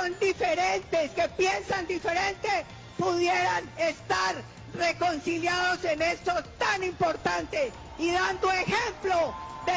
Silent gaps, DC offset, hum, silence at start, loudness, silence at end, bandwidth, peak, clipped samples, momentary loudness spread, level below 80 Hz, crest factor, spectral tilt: none; under 0.1%; none; 0 s; -28 LUFS; 0 s; 8 kHz; -14 dBFS; under 0.1%; 5 LU; -52 dBFS; 14 dB; -3.5 dB/octave